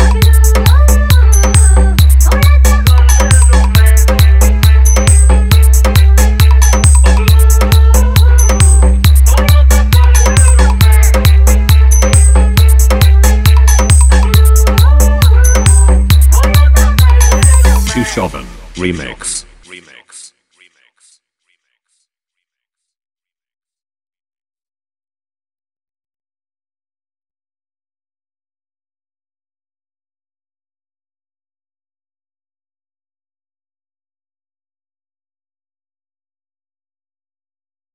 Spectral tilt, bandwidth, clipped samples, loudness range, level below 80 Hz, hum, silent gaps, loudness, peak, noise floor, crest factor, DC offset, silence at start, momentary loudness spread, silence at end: -4.5 dB/octave; 16 kHz; 0.5%; 6 LU; -10 dBFS; none; none; -8 LUFS; 0 dBFS; -78 dBFS; 8 dB; under 0.1%; 0 s; 1 LU; 18.2 s